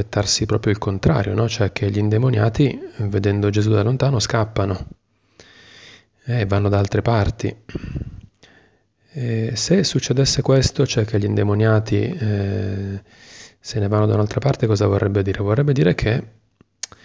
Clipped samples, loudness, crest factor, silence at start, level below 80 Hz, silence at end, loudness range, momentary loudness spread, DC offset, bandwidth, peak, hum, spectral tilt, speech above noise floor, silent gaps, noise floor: under 0.1%; -19 LUFS; 16 dB; 0 s; -38 dBFS; 0.75 s; 5 LU; 12 LU; under 0.1%; 8 kHz; -4 dBFS; none; -6 dB/octave; 40 dB; none; -59 dBFS